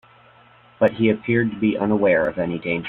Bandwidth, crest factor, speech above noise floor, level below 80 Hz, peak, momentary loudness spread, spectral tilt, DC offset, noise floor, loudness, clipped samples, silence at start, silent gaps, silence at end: 4.2 kHz; 18 dB; 32 dB; -54 dBFS; -4 dBFS; 6 LU; -9.5 dB/octave; under 0.1%; -51 dBFS; -20 LUFS; under 0.1%; 0.8 s; none; 0 s